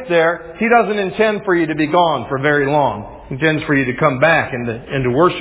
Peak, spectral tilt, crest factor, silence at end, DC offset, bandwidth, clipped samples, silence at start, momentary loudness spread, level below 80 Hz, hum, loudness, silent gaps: 0 dBFS; -10 dB/octave; 16 dB; 0 s; under 0.1%; 4 kHz; under 0.1%; 0 s; 7 LU; -44 dBFS; none; -16 LUFS; none